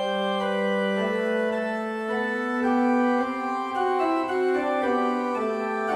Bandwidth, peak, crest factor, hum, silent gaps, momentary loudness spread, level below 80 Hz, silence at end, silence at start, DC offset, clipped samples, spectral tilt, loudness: 12 kHz; -12 dBFS; 14 dB; none; none; 5 LU; -66 dBFS; 0 s; 0 s; under 0.1%; under 0.1%; -6 dB/octave; -25 LUFS